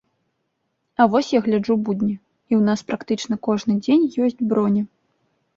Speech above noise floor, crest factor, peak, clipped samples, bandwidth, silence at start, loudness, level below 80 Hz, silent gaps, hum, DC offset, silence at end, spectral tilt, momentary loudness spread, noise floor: 54 dB; 18 dB; -2 dBFS; under 0.1%; 7.6 kHz; 1 s; -20 LUFS; -62 dBFS; none; none; under 0.1%; 0.7 s; -6.5 dB/octave; 8 LU; -73 dBFS